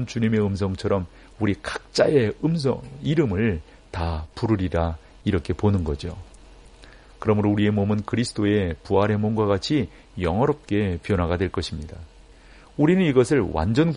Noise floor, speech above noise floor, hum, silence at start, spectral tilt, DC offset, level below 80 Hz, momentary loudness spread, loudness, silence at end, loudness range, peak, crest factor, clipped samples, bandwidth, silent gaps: -48 dBFS; 26 dB; none; 0 s; -7 dB/octave; under 0.1%; -40 dBFS; 10 LU; -23 LUFS; 0 s; 3 LU; -6 dBFS; 18 dB; under 0.1%; 10.5 kHz; none